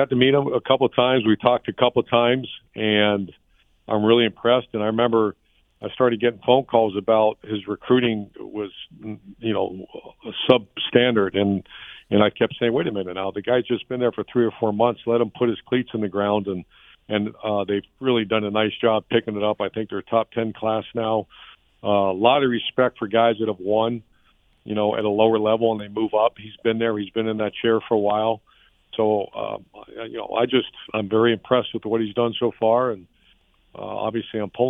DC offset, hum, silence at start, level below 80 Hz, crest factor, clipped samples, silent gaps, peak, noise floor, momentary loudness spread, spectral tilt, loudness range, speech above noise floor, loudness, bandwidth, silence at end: under 0.1%; none; 0 s; -60 dBFS; 22 dB; under 0.1%; none; 0 dBFS; -60 dBFS; 13 LU; -9 dB/octave; 3 LU; 39 dB; -22 LUFS; 4 kHz; 0 s